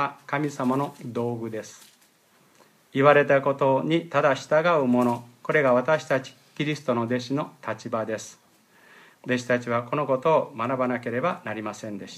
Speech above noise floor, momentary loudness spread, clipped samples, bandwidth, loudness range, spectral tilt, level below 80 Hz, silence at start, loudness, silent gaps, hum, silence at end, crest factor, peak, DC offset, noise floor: 36 dB; 12 LU; under 0.1%; 14.5 kHz; 7 LU; -6 dB/octave; -74 dBFS; 0 s; -24 LUFS; none; none; 0 s; 22 dB; -4 dBFS; under 0.1%; -60 dBFS